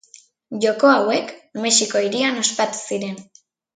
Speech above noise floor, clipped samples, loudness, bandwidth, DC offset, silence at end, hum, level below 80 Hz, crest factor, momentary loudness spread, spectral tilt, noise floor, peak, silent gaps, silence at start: 31 dB; under 0.1%; -19 LUFS; 9.6 kHz; under 0.1%; 0.55 s; none; -70 dBFS; 18 dB; 16 LU; -2 dB/octave; -50 dBFS; -2 dBFS; none; 0.5 s